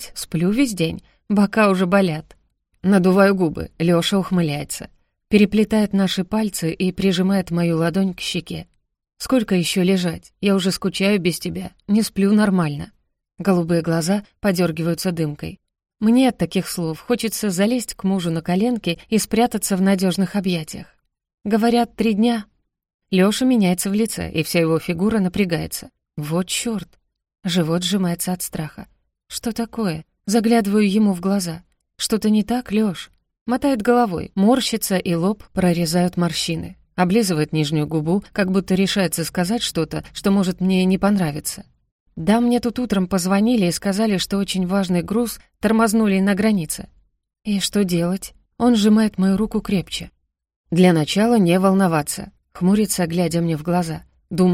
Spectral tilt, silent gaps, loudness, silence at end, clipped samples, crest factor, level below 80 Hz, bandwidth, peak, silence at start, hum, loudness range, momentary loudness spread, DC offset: -5.5 dB/octave; 21.34-21.38 s, 22.94-22.99 s, 33.41-33.46 s, 41.92-42.06 s, 50.56-50.64 s; -19 LUFS; 0 s; under 0.1%; 18 dB; -48 dBFS; 16 kHz; 0 dBFS; 0 s; none; 3 LU; 11 LU; under 0.1%